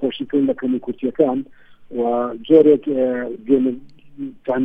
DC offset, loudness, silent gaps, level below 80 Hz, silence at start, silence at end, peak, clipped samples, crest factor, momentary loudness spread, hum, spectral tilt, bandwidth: under 0.1%; -18 LUFS; none; -56 dBFS; 0 s; 0 s; -2 dBFS; under 0.1%; 18 dB; 18 LU; none; -9 dB/octave; 3.7 kHz